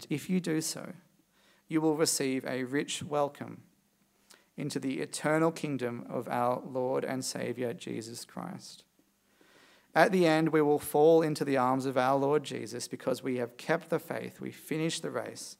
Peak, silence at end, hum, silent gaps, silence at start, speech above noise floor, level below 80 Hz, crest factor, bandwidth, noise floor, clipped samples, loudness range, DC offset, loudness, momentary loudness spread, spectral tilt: -6 dBFS; 0.05 s; none; none; 0 s; 40 dB; -80 dBFS; 24 dB; 16 kHz; -70 dBFS; under 0.1%; 8 LU; under 0.1%; -31 LUFS; 16 LU; -5 dB/octave